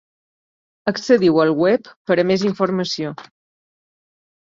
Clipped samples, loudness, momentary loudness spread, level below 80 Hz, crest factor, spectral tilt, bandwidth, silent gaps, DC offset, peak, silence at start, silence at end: under 0.1%; -18 LUFS; 11 LU; -62 dBFS; 18 dB; -6 dB/octave; 7.6 kHz; 1.96-2.05 s; under 0.1%; -2 dBFS; 0.85 s; 1.2 s